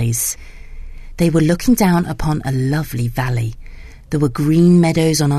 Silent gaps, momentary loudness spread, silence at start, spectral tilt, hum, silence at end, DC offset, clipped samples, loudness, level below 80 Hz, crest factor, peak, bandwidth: none; 10 LU; 0 s; -6 dB/octave; none; 0 s; under 0.1%; under 0.1%; -16 LUFS; -32 dBFS; 14 dB; -2 dBFS; 13.5 kHz